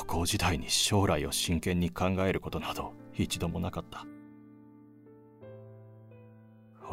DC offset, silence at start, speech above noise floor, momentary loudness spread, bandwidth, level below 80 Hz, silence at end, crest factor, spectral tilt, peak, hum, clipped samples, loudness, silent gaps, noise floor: under 0.1%; 0 s; 25 dB; 24 LU; 16 kHz; -48 dBFS; 0 s; 22 dB; -4 dB/octave; -12 dBFS; none; under 0.1%; -30 LUFS; none; -55 dBFS